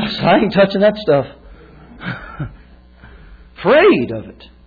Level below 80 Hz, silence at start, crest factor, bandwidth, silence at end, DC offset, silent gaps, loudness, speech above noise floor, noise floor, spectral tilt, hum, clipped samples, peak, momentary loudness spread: -42 dBFS; 0 s; 14 dB; 4.9 kHz; 0.35 s; under 0.1%; none; -14 LUFS; 29 dB; -43 dBFS; -8.5 dB/octave; none; under 0.1%; -2 dBFS; 19 LU